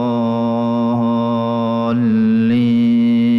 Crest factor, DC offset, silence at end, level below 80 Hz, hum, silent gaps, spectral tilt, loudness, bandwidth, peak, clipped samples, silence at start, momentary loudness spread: 6 dB; under 0.1%; 0 s; -56 dBFS; none; none; -9.5 dB/octave; -16 LUFS; 5.8 kHz; -8 dBFS; under 0.1%; 0 s; 4 LU